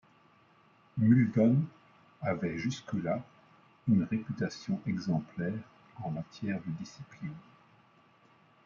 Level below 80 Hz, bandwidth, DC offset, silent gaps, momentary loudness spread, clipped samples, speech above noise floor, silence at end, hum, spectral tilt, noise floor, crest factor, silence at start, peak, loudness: -68 dBFS; 7.4 kHz; under 0.1%; none; 17 LU; under 0.1%; 33 dB; 1.25 s; none; -8 dB/octave; -64 dBFS; 20 dB; 0.95 s; -12 dBFS; -32 LUFS